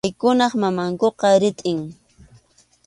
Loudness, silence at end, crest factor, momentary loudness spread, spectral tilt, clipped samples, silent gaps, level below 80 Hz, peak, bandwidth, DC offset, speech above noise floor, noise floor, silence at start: -19 LUFS; 0.95 s; 18 dB; 9 LU; -5.5 dB/octave; under 0.1%; none; -58 dBFS; -4 dBFS; 11.5 kHz; under 0.1%; 37 dB; -56 dBFS; 0.05 s